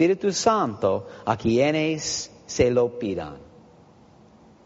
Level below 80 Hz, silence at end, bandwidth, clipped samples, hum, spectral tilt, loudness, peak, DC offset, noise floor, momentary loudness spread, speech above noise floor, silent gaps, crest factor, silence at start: -52 dBFS; 1.2 s; 8 kHz; under 0.1%; none; -4.5 dB/octave; -23 LUFS; -4 dBFS; under 0.1%; -52 dBFS; 9 LU; 29 dB; none; 20 dB; 0 s